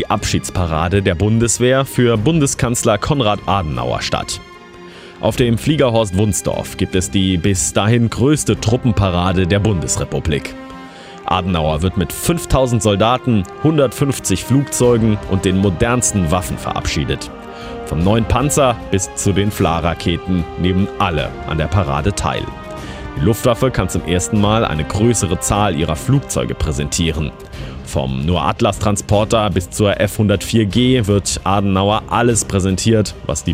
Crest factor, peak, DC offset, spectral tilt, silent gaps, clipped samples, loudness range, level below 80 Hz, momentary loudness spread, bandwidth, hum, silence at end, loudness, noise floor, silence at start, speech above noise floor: 16 dB; 0 dBFS; under 0.1%; -5 dB/octave; none; under 0.1%; 3 LU; -30 dBFS; 8 LU; 16 kHz; none; 0 s; -16 LUFS; -36 dBFS; 0 s; 21 dB